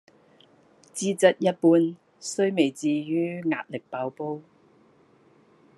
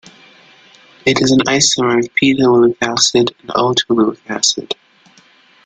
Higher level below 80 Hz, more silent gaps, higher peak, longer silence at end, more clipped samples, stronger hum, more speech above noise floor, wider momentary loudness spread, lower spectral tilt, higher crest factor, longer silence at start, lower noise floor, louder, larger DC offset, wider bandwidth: second, -80 dBFS vs -52 dBFS; neither; second, -6 dBFS vs 0 dBFS; first, 1.35 s vs 0.9 s; neither; neither; about the same, 35 dB vs 35 dB; first, 14 LU vs 6 LU; first, -5 dB/octave vs -3 dB/octave; about the same, 20 dB vs 16 dB; about the same, 0.95 s vs 1.05 s; first, -59 dBFS vs -49 dBFS; second, -25 LUFS vs -13 LUFS; neither; first, 12 kHz vs 9.4 kHz